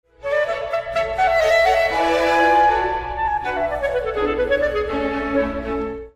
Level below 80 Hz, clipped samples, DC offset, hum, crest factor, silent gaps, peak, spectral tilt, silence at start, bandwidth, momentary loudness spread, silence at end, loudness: -38 dBFS; under 0.1%; under 0.1%; none; 14 dB; none; -6 dBFS; -4.5 dB/octave; 0.2 s; 15.5 kHz; 8 LU; 0.05 s; -19 LUFS